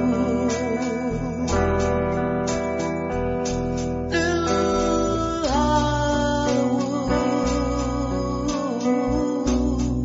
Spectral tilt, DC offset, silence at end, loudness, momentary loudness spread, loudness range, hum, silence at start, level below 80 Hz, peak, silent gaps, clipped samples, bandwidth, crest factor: -5.5 dB/octave; under 0.1%; 0 s; -23 LUFS; 4 LU; 2 LU; none; 0 s; -34 dBFS; -8 dBFS; none; under 0.1%; 7.8 kHz; 14 dB